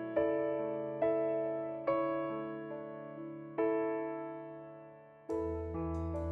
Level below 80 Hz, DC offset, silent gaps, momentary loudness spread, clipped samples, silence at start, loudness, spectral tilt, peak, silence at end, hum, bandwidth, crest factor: -58 dBFS; under 0.1%; none; 13 LU; under 0.1%; 0 s; -37 LUFS; -9.5 dB/octave; -20 dBFS; 0 s; none; 4.8 kHz; 18 dB